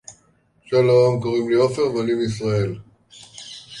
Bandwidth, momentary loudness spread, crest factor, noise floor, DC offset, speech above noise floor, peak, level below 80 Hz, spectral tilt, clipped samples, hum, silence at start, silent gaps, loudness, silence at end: 11.5 kHz; 21 LU; 16 dB; -60 dBFS; under 0.1%; 41 dB; -6 dBFS; -54 dBFS; -6.5 dB/octave; under 0.1%; none; 0.1 s; none; -19 LUFS; 0 s